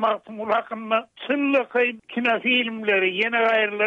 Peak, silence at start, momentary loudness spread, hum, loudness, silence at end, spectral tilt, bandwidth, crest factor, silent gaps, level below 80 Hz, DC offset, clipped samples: -8 dBFS; 0 s; 6 LU; none; -22 LUFS; 0 s; -5.5 dB/octave; 7.4 kHz; 14 dB; none; -72 dBFS; under 0.1%; under 0.1%